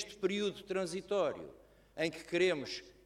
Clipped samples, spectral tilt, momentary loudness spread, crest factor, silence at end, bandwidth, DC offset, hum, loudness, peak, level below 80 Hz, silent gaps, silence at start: under 0.1%; -4.5 dB/octave; 13 LU; 18 dB; 0.15 s; 13.5 kHz; under 0.1%; none; -36 LUFS; -18 dBFS; -68 dBFS; none; 0 s